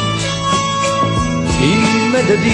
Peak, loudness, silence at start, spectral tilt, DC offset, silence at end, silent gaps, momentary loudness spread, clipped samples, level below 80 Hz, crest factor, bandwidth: 0 dBFS; -14 LUFS; 0 s; -4.5 dB/octave; under 0.1%; 0 s; none; 4 LU; under 0.1%; -32 dBFS; 14 dB; 11 kHz